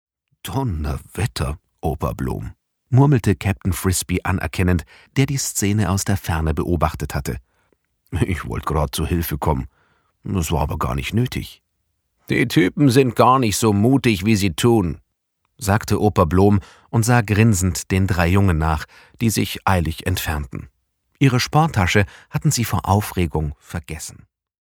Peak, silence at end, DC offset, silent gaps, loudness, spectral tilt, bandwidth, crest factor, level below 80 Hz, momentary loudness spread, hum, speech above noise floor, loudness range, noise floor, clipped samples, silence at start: 0 dBFS; 0.55 s; under 0.1%; none; -20 LUFS; -5.5 dB/octave; 19 kHz; 20 dB; -34 dBFS; 12 LU; none; 53 dB; 6 LU; -72 dBFS; under 0.1%; 0.45 s